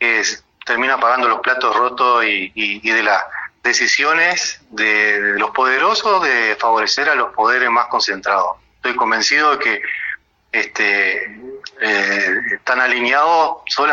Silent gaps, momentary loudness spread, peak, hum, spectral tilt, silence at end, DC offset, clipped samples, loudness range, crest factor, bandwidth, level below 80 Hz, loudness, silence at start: none; 9 LU; 0 dBFS; none; -1 dB/octave; 0 s; under 0.1%; under 0.1%; 3 LU; 16 dB; 7.6 kHz; -60 dBFS; -15 LUFS; 0 s